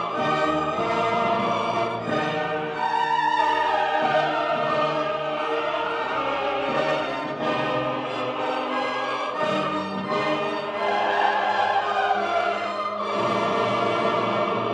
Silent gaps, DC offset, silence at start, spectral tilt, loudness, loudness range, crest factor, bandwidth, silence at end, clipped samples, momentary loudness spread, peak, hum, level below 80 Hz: none; under 0.1%; 0 s; -5 dB/octave; -24 LUFS; 3 LU; 16 dB; 10 kHz; 0 s; under 0.1%; 5 LU; -8 dBFS; none; -62 dBFS